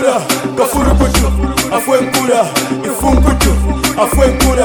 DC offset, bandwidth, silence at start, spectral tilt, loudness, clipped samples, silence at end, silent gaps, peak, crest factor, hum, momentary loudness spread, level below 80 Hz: under 0.1%; over 20 kHz; 0 s; -4.5 dB/octave; -12 LUFS; 0.1%; 0 s; none; 0 dBFS; 12 dB; none; 4 LU; -16 dBFS